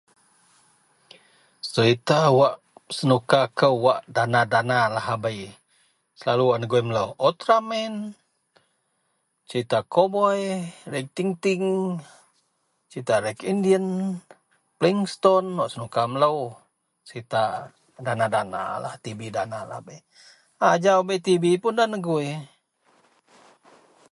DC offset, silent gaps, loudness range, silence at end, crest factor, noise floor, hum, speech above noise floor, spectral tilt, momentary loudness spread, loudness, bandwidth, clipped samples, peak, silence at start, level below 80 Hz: under 0.1%; none; 6 LU; 1.65 s; 20 dB; -72 dBFS; none; 50 dB; -5.5 dB/octave; 15 LU; -23 LUFS; 11.5 kHz; under 0.1%; -4 dBFS; 1.65 s; -66 dBFS